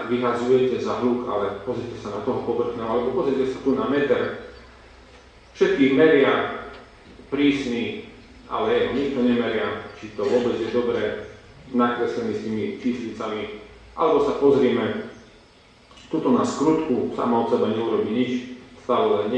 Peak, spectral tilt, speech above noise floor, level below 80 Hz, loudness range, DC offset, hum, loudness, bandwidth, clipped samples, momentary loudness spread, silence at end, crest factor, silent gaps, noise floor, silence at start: -4 dBFS; -6 dB/octave; 30 dB; -54 dBFS; 3 LU; under 0.1%; none; -23 LUFS; 9 kHz; under 0.1%; 13 LU; 0 s; 18 dB; none; -52 dBFS; 0 s